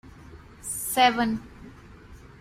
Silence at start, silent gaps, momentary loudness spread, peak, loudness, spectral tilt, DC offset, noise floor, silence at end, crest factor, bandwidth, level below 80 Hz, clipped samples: 0.05 s; none; 24 LU; -4 dBFS; -24 LUFS; -2.5 dB/octave; under 0.1%; -47 dBFS; 0.15 s; 24 dB; 16 kHz; -52 dBFS; under 0.1%